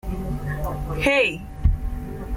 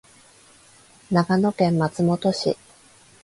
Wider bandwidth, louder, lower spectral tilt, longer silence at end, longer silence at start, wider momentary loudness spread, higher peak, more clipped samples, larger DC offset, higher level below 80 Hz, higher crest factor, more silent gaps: first, 16.5 kHz vs 11.5 kHz; about the same, -24 LUFS vs -22 LUFS; about the same, -6 dB/octave vs -6.5 dB/octave; second, 0 s vs 0.7 s; second, 0.05 s vs 1.1 s; first, 12 LU vs 6 LU; about the same, -8 dBFS vs -6 dBFS; neither; neither; first, -28 dBFS vs -60 dBFS; about the same, 16 dB vs 16 dB; neither